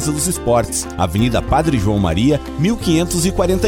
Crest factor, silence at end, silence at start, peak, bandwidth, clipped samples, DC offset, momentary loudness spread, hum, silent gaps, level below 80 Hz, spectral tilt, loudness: 12 dB; 0 s; 0 s; -4 dBFS; 17.5 kHz; under 0.1%; under 0.1%; 3 LU; none; none; -28 dBFS; -5 dB/octave; -17 LUFS